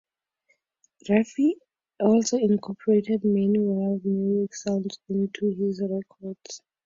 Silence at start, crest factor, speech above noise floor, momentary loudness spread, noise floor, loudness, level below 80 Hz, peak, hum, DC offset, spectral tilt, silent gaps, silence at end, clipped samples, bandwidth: 1.05 s; 18 dB; 46 dB; 16 LU; -70 dBFS; -25 LUFS; -68 dBFS; -8 dBFS; none; under 0.1%; -6.5 dB/octave; none; 0.3 s; under 0.1%; 7.8 kHz